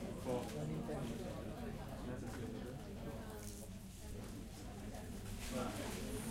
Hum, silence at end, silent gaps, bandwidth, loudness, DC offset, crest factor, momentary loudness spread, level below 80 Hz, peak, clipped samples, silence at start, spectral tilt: none; 0 s; none; 16 kHz; -47 LUFS; under 0.1%; 16 dB; 8 LU; -54 dBFS; -28 dBFS; under 0.1%; 0 s; -5.5 dB/octave